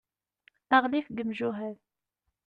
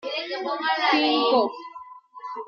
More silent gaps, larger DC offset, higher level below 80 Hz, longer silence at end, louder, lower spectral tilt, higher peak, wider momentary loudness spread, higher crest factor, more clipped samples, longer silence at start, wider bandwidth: neither; neither; first, -72 dBFS vs -78 dBFS; first, 0.75 s vs 0 s; second, -28 LUFS vs -22 LUFS; first, -7 dB/octave vs -3.5 dB/octave; about the same, -10 dBFS vs -8 dBFS; second, 13 LU vs 20 LU; first, 22 dB vs 16 dB; neither; first, 0.7 s vs 0.05 s; about the same, 6.8 kHz vs 6.8 kHz